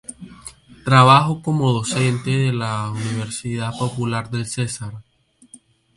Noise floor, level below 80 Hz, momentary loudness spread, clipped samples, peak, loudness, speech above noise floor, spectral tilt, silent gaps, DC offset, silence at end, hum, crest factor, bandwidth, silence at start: -49 dBFS; -54 dBFS; 22 LU; under 0.1%; 0 dBFS; -19 LUFS; 31 dB; -5.5 dB/octave; none; under 0.1%; 0.95 s; none; 20 dB; 11.5 kHz; 0.1 s